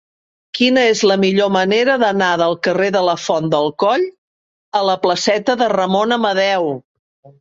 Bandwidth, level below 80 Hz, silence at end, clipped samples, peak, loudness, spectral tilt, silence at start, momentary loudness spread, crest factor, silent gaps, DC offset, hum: 7.8 kHz; -60 dBFS; 0.15 s; under 0.1%; -2 dBFS; -15 LUFS; -4.5 dB/octave; 0.55 s; 6 LU; 14 dB; 4.18-4.72 s, 6.85-7.23 s; under 0.1%; none